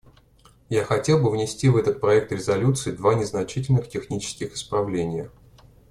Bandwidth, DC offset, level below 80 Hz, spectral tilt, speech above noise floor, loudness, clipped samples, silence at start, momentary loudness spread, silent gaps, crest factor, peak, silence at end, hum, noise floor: 12.5 kHz; under 0.1%; -52 dBFS; -6 dB/octave; 33 dB; -23 LUFS; under 0.1%; 0.7 s; 10 LU; none; 16 dB; -6 dBFS; 0.6 s; none; -55 dBFS